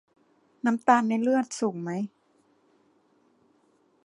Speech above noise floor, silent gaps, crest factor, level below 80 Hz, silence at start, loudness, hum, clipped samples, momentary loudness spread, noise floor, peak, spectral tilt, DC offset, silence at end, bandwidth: 41 dB; none; 24 dB; -82 dBFS; 0.65 s; -26 LUFS; none; under 0.1%; 11 LU; -66 dBFS; -6 dBFS; -5.5 dB/octave; under 0.1%; 2 s; 11 kHz